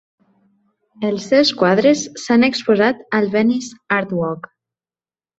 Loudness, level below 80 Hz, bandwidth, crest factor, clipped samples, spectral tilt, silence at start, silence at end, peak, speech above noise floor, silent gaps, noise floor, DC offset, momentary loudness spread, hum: -17 LUFS; -60 dBFS; 8 kHz; 16 dB; under 0.1%; -4.5 dB/octave; 1 s; 1 s; -2 dBFS; over 74 dB; none; under -90 dBFS; under 0.1%; 9 LU; none